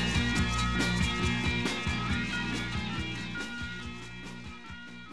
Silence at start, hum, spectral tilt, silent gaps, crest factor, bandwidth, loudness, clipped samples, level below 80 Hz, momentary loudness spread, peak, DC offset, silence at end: 0 s; none; -4.5 dB/octave; none; 16 dB; 13 kHz; -31 LUFS; under 0.1%; -40 dBFS; 15 LU; -16 dBFS; 0.4%; 0 s